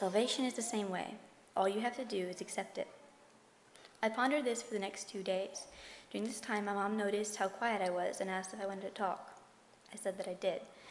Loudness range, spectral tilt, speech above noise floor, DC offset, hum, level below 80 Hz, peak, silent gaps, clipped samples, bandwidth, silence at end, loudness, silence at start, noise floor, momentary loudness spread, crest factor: 2 LU; -3.5 dB/octave; 27 dB; under 0.1%; none; -80 dBFS; -20 dBFS; none; under 0.1%; 11.5 kHz; 0 s; -38 LUFS; 0 s; -64 dBFS; 12 LU; 20 dB